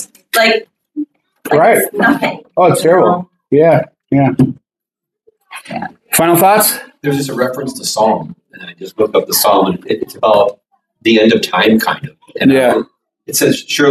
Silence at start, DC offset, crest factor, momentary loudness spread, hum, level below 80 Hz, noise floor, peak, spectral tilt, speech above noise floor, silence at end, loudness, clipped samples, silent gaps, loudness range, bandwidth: 0 s; under 0.1%; 12 dB; 16 LU; none; -54 dBFS; -83 dBFS; 0 dBFS; -4 dB/octave; 72 dB; 0 s; -12 LUFS; under 0.1%; none; 3 LU; 16 kHz